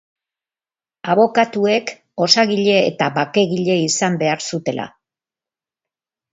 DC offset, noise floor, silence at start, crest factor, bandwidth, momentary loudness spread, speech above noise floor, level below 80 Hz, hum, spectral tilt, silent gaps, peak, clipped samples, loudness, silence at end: under 0.1%; under -90 dBFS; 1.05 s; 18 dB; 8 kHz; 11 LU; over 73 dB; -66 dBFS; none; -4 dB/octave; none; 0 dBFS; under 0.1%; -17 LUFS; 1.45 s